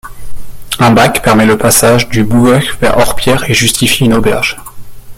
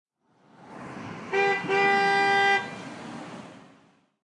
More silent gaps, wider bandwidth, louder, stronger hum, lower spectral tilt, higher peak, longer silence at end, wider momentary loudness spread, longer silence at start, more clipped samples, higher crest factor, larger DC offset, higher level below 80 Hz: neither; first, over 20 kHz vs 11 kHz; first, -9 LUFS vs -23 LUFS; neither; about the same, -4 dB/octave vs -4 dB/octave; first, 0 dBFS vs -12 dBFS; second, 0.05 s vs 0.65 s; second, 5 LU vs 21 LU; second, 0.05 s vs 0.6 s; first, 0.2% vs under 0.1%; second, 10 dB vs 16 dB; neither; first, -28 dBFS vs -74 dBFS